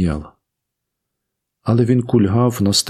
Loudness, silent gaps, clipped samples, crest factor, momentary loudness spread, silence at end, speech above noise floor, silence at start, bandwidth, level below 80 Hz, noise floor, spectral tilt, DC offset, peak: -16 LUFS; none; under 0.1%; 16 dB; 11 LU; 0 s; 63 dB; 0 s; 15 kHz; -44 dBFS; -79 dBFS; -5.5 dB/octave; under 0.1%; -2 dBFS